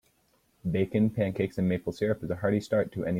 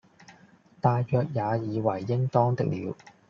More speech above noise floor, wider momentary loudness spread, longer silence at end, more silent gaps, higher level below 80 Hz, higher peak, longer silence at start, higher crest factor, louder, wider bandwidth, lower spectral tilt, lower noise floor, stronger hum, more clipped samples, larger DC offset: first, 41 dB vs 31 dB; about the same, 4 LU vs 5 LU; second, 0 s vs 0.35 s; neither; first, -58 dBFS vs -66 dBFS; second, -14 dBFS vs -8 dBFS; first, 0.65 s vs 0.3 s; about the same, 16 dB vs 20 dB; about the same, -29 LUFS vs -27 LUFS; first, 15.5 kHz vs 6.8 kHz; about the same, -8 dB/octave vs -8.5 dB/octave; first, -69 dBFS vs -57 dBFS; neither; neither; neither